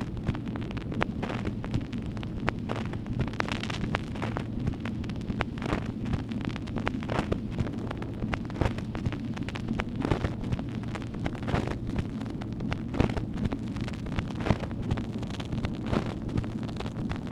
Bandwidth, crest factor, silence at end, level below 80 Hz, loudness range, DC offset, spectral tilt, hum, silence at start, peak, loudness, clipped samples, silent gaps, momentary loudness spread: 11.5 kHz; 26 dB; 0 s; -40 dBFS; 1 LU; under 0.1%; -7 dB/octave; none; 0 s; -4 dBFS; -32 LUFS; under 0.1%; none; 5 LU